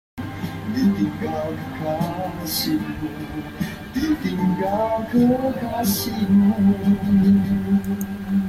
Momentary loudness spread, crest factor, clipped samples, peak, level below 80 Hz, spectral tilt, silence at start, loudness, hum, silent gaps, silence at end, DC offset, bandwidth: 12 LU; 14 dB; under 0.1%; -8 dBFS; -46 dBFS; -6.5 dB/octave; 0.15 s; -21 LUFS; none; none; 0 s; under 0.1%; 15.5 kHz